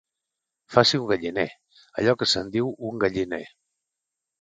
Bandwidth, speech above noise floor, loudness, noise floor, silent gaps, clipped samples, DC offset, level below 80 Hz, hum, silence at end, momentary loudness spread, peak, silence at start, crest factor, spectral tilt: 9.4 kHz; 62 dB; -24 LUFS; -85 dBFS; none; under 0.1%; under 0.1%; -58 dBFS; none; 0.95 s; 11 LU; 0 dBFS; 0.7 s; 26 dB; -4.5 dB/octave